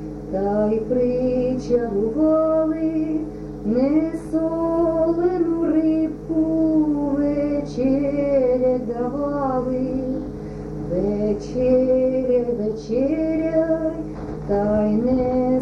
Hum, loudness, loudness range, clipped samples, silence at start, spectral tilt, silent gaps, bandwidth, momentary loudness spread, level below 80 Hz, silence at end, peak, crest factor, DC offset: none; -21 LUFS; 2 LU; under 0.1%; 0 s; -9 dB/octave; none; 7 kHz; 7 LU; -40 dBFS; 0 s; -8 dBFS; 12 dB; under 0.1%